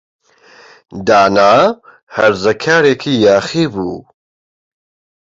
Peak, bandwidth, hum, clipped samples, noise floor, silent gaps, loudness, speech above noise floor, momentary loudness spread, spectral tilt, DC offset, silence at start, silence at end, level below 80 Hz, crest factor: 0 dBFS; 7.8 kHz; none; under 0.1%; -44 dBFS; 2.03-2.07 s; -12 LUFS; 32 dB; 16 LU; -5 dB/octave; under 0.1%; 0.95 s; 1.4 s; -50 dBFS; 14 dB